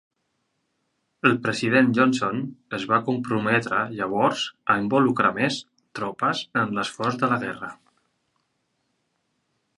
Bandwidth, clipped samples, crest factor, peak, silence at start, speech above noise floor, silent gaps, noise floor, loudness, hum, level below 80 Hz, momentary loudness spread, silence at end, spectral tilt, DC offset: 11.5 kHz; under 0.1%; 24 dB; -2 dBFS; 1.25 s; 51 dB; none; -74 dBFS; -23 LUFS; none; -66 dBFS; 12 LU; 2.05 s; -5.5 dB/octave; under 0.1%